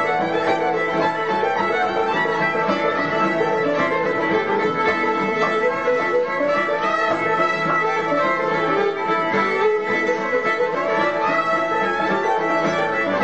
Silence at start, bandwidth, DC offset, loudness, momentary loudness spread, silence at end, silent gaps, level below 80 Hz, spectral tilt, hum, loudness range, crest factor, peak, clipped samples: 0 s; 8.4 kHz; 0.3%; -19 LUFS; 1 LU; 0 s; none; -58 dBFS; -5.5 dB/octave; none; 0 LU; 14 dB; -6 dBFS; under 0.1%